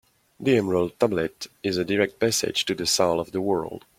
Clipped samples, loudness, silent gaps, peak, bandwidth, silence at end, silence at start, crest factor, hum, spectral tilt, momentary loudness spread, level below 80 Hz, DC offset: under 0.1%; -24 LUFS; none; -4 dBFS; 16.5 kHz; 0.2 s; 0.4 s; 20 dB; none; -4 dB/octave; 7 LU; -58 dBFS; under 0.1%